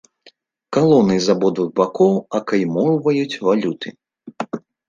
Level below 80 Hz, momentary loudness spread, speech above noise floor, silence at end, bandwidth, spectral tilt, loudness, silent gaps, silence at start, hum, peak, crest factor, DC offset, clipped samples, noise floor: -58 dBFS; 15 LU; 36 dB; 0.3 s; 7.6 kHz; -6.5 dB/octave; -18 LUFS; none; 0.7 s; none; -2 dBFS; 16 dB; under 0.1%; under 0.1%; -53 dBFS